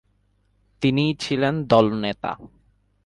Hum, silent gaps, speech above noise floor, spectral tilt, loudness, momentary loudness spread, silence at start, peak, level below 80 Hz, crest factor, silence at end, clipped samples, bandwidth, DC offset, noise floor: 50 Hz at -50 dBFS; none; 44 dB; -6.5 dB/octave; -22 LUFS; 12 LU; 0.8 s; -2 dBFS; -54 dBFS; 22 dB; 0.6 s; under 0.1%; 11.5 kHz; under 0.1%; -65 dBFS